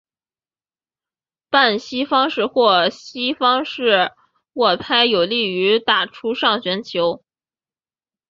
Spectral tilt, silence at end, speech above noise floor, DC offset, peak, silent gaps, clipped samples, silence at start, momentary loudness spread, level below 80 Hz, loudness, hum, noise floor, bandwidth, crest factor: -4.5 dB/octave; 1.15 s; over 72 dB; under 0.1%; -2 dBFS; none; under 0.1%; 1.5 s; 8 LU; -64 dBFS; -17 LUFS; none; under -90 dBFS; 7.4 kHz; 18 dB